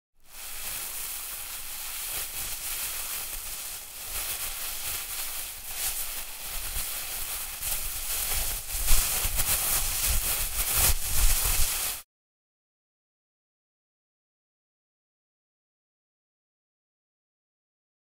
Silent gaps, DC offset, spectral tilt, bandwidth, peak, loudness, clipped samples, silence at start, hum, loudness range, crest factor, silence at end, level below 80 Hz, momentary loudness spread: none; under 0.1%; -0.5 dB/octave; 16 kHz; -6 dBFS; -28 LUFS; under 0.1%; 0.25 s; none; 7 LU; 24 dB; 6 s; -36 dBFS; 10 LU